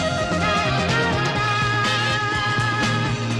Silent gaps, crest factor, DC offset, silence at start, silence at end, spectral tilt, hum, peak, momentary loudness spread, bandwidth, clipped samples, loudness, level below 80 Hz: none; 12 dB; under 0.1%; 0 s; 0 s; -4.5 dB/octave; none; -8 dBFS; 2 LU; 12.5 kHz; under 0.1%; -20 LUFS; -42 dBFS